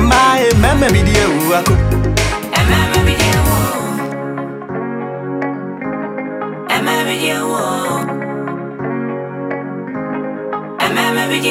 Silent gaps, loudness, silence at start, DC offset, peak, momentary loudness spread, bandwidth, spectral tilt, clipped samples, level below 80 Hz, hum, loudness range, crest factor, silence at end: none; -16 LUFS; 0 s; under 0.1%; 0 dBFS; 12 LU; 17 kHz; -5 dB/octave; under 0.1%; -26 dBFS; none; 8 LU; 16 dB; 0 s